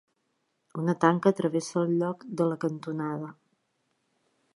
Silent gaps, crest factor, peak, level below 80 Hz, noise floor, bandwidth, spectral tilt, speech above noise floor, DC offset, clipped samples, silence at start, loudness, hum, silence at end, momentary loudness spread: none; 22 dB; -6 dBFS; -78 dBFS; -76 dBFS; 11.5 kHz; -7 dB/octave; 49 dB; under 0.1%; under 0.1%; 0.75 s; -28 LUFS; none; 1.25 s; 11 LU